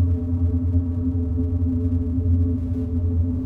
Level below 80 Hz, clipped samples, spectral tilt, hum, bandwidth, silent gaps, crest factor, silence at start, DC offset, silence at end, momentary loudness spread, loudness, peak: -28 dBFS; under 0.1%; -12.5 dB/octave; none; 1.5 kHz; none; 12 dB; 0 s; under 0.1%; 0 s; 3 LU; -23 LUFS; -10 dBFS